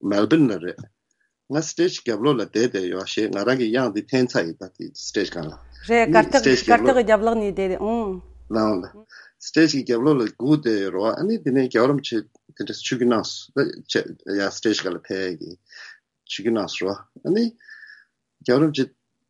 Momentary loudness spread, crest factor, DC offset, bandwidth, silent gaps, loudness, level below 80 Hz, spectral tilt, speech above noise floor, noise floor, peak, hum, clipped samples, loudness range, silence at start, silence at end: 15 LU; 22 dB; under 0.1%; 11 kHz; none; -21 LUFS; -52 dBFS; -5 dB/octave; 50 dB; -72 dBFS; 0 dBFS; none; under 0.1%; 7 LU; 0.05 s; 0.4 s